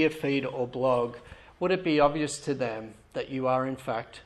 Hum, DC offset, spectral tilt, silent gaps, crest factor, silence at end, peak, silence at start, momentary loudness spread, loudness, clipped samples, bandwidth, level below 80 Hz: none; under 0.1%; -5.5 dB/octave; none; 18 dB; 0.05 s; -10 dBFS; 0 s; 11 LU; -29 LUFS; under 0.1%; 13 kHz; -60 dBFS